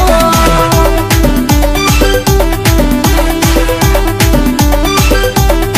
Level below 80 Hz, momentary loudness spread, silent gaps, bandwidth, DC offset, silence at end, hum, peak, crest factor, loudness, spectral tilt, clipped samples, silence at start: -12 dBFS; 2 LU; none; 16 kHz; under 0.1%; 0 s; none; 0 dBFS; 8 dB; -9 LUFS; -4.5 dB/octave; under 0.1%; 0 s